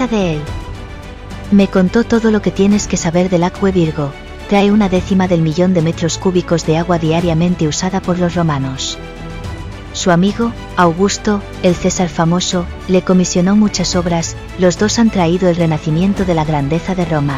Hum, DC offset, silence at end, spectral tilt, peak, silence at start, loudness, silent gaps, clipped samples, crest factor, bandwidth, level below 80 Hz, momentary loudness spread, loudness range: none; 0.3%; 0 s; -5.5 dB/octave; 0 dBFS; 0 s; -14 LUFS; none; under 0.1%; 14 dB; 10 kHz; -32 dBFS; 11 LU; 3 LU